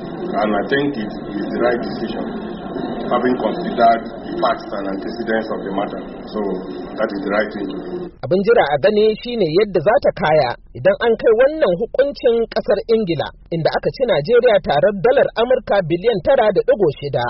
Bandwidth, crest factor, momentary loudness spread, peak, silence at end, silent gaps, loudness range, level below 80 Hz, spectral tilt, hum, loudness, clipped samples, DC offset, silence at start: 5.8 kHz; 16 dB; 11 LU; -2 dBFS; 0 s; none; 7 LU; -44 dBFS; -4.5 dB/octave; none; -18 LUFS; under 0.1%; under 0.1%; 0 s